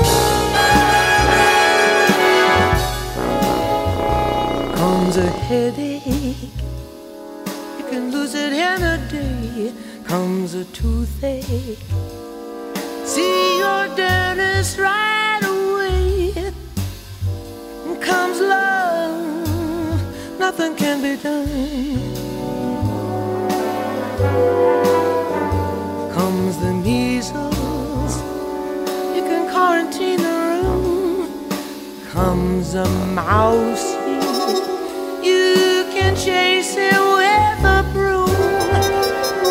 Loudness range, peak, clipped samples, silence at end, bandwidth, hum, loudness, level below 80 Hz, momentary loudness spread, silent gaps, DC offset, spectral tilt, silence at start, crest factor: 7 LU; -2 dBFS; under 0.1%; 0 s; 16 kHz; none; -18 LUFS; -32 dBFS; 13 LU; none; under 0.1%; -4.5 dB/octave; 0 s; 16 dB